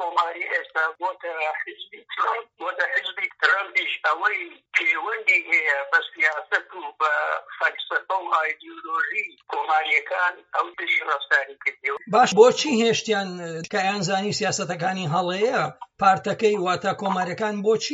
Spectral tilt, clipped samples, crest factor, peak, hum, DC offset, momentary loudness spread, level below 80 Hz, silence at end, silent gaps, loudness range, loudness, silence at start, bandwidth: -1.5 dB/octave; under 0.1%; 22 dB; -2 dBFS; none; under 0.1%; 9 LU; -74 dBFS; 0 s; none; 4 LU; -23 LUFS; 0 s; 8 kHz